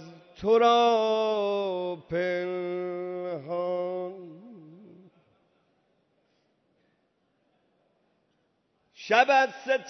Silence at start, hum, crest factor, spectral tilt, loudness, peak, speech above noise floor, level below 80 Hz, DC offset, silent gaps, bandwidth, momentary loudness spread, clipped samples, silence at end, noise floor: 0 s; none; 22 dB; -4.5 dB/octave; -26 LUFS; -6 dBFS; 48 dB; -70 dBFS; under 0.1%; none; 6.4 kHz; 14 LU; under 0.1%; 0 s; -73 dBFS